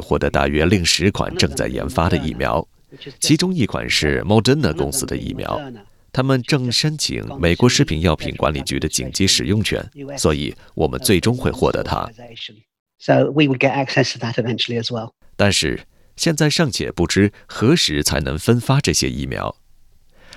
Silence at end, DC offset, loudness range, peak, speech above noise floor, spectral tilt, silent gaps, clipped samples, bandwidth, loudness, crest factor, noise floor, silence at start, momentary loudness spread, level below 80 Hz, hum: 0 s; under 0.1%; 2 LU; 0 dBFS; 30 dB; -4.5 dB/octave; 12.79-12.86 s; under 0.1%; 15.5 kHz; -18 LUFS; 18 dB; -49 dBFS; 0 s; 11 LU; -38 dBFS; none